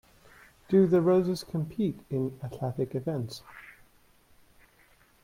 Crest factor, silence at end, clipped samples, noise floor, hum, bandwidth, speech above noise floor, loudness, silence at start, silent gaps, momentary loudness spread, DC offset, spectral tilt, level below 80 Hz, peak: 18 dB; 1.55 s; under 0.1%; -62 dBFS; none; 15.5 kHz; 34 dB; -28 LUFS; 0.7 s; none; 17 LU; under 0.1%; -8 dB/octave; -62 dBFS; -12 dBFS